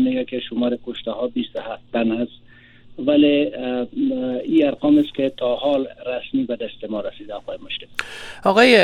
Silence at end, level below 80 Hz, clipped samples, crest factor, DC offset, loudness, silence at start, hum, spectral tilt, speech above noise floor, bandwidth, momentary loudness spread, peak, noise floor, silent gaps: 0 s; -54 dBFS; under 0.1%; 20 dB; under 0.1%; -21 LUFS; 0 s; none; -5.5 dB/octave; 25 dB; 12 kHz; 13 LU; 0 dBFS; -45 dBFS; none